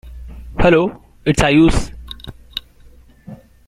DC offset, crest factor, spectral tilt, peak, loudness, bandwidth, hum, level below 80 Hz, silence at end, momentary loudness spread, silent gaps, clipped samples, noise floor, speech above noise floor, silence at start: under 0.1%; 18 dB; -5.5 dB/octave; 0 dBFS; -15 LUFS; 14 kHz; none; -28 dBFS; 0.3 s; 21 LU; none; under 0.1%; -44 dBFS; 31 dB; 0.05 s